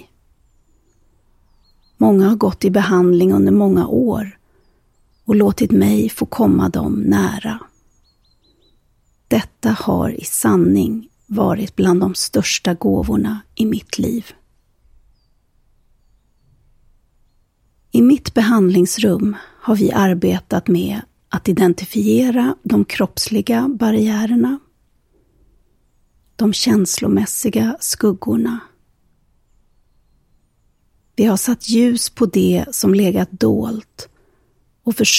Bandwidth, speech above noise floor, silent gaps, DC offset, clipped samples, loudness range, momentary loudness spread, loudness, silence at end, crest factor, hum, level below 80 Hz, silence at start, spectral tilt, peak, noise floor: 16 kHz; 44 dB; none; under 0.1%; under 0.1%; 7 LU; 10 LU; -16 LUFS; 0 s; 18 dB; none; -44 dBFS; 2 s; -5 dB/octave; 0 dBFS; -60 dBFS